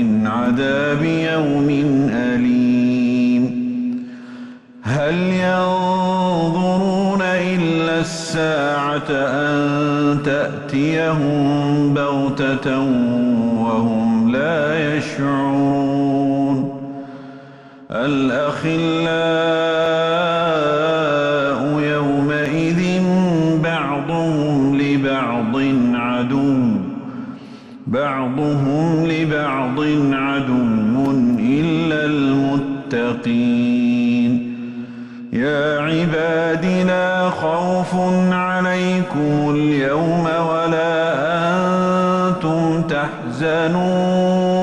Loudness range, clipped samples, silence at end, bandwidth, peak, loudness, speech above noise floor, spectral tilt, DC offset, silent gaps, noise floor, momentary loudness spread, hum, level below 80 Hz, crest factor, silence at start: 2 LU; under 0.1%; 0 s; 11 kHz; -6 dBFS; -18 LUFS; 23 dB; -7 dB/octave; under 0.1%; none; -40 dBFS; 5 LU; none; -50 dBFS; 10 dB; 0 s